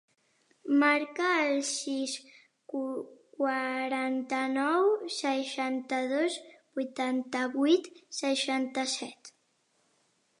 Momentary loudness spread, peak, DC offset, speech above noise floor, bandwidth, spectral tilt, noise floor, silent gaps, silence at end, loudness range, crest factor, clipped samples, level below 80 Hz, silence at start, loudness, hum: 12 LU; -12 dBFS; under 0.1%; 43 dB; 11 kHz; -1.5 dB/octave; -73 dBFS; none; 1.1 s; 2 LU; 18 dB; under 0.1%; -86 dBFS; 0.65 s; -30 LUFS; none